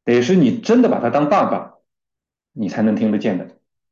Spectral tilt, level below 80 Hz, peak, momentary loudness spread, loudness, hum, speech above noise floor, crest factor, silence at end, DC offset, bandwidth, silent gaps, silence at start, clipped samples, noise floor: -7 dB/octave; -62 dBFS; -4 dBFS; 12 LU; -17 LUFS; none; 69 dB; 14 dB; 0.4 s; under 0.1%; 7.4 kHz; none; 0.05 s; under 0.1%; -85 dBFS